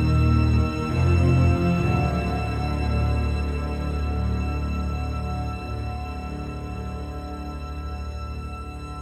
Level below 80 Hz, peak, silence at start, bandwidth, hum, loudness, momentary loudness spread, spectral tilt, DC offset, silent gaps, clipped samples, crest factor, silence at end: -28 dBFS; -8 dBFS; 0 s; 9.8 kHz; none; -25 LUFS; 14 LU; -8 dB/octave; under 0.1%; none; under 0.1%; 16 dB; 0 s